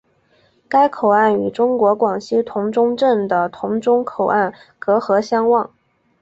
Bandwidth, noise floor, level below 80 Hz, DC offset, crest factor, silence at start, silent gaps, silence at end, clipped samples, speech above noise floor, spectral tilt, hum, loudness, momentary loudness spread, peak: 7.8 kHz; -58 dBFS; -62 dBFS; under 0.1%; 16 dB; 0.7 s; none; 0.55 s; under 0.1%; 41 dB; -6.5 dB/octave; none; -17 LUFS; 6 LU; -2 dBFS